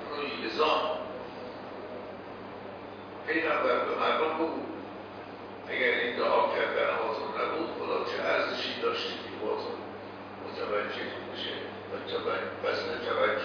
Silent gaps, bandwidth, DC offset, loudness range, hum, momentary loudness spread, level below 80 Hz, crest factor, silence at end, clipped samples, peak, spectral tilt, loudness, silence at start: none; 5.4 kHz; under 0.1%; 5 LU; none; 15 LU; -70 dBFS; 18 dB; 0 s; under 0.1%; -14 dBFS; -5 dB/octave; -31 LUFS; 0 s